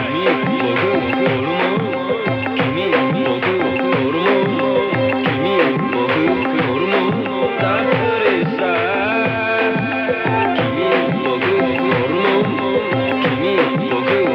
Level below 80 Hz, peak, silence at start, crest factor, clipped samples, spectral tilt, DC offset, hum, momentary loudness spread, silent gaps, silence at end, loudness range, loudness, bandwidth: -52 dBFS; -2 dBFS; 0 s; 14 dB; under 0.1%; -8 dB/octave; under 0.1%; none; 3 LU; none; 0 s; 1 LU; -17 LUFS; 5.8 kHz